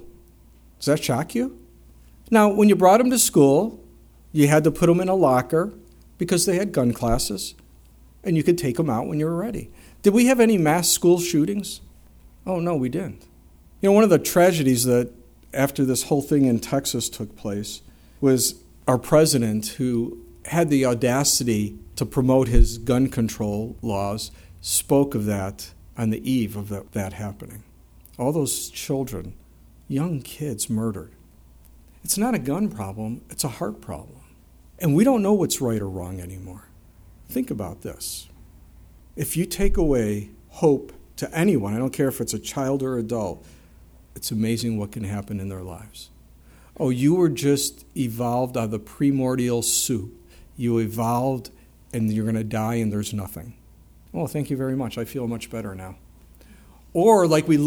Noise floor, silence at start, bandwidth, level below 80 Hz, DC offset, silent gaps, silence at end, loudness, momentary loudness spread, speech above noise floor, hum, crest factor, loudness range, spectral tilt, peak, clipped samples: -51 dBFS; 0 s; over 20 kHz; -36 dBFS; under 0.1%; none; 0 s; -22 LUFS; 16 LU; 30 dB; none; 20 dB; 9 LU; -5 dB/octave; -2 dBFS; under 0.1%